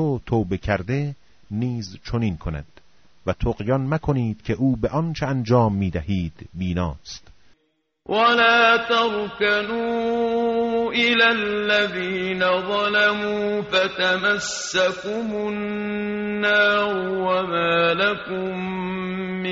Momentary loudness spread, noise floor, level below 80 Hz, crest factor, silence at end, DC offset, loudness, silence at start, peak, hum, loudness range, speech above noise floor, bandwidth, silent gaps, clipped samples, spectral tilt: 10 LU; -70 dBFS; -42 dBFS; 18 dB; 0 s; under 0.1%; -21 LUFS; 0 s; -4 dBFS; none; 6 LU; 48 dB; 7.4 kHz; none; under 0.1%; -3.5 dB/octave